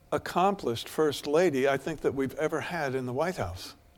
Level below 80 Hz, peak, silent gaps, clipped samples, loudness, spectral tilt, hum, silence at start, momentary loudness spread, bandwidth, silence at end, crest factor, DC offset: -56 dBFS; -10 dBFS; none; under 0.1%; -29 LUFS; -5.5 dB/octave; none; 0.1 s; 7 LU; 17.5 kHz; 0.25 s; 18 dB; under 0.1%